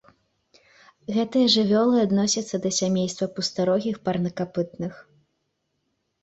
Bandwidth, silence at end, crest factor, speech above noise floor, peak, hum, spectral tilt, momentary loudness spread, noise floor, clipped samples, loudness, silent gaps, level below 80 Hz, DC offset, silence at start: 8.2 kHz; 1.2 s; 18 dB; 52 dB; -6 dBFS; none; -4.5 dB/octave; 10 LU; -75 dBFS; under 0.1%; -23 LUFS; none; -64 dBFS; under 0.1%; 1.1 s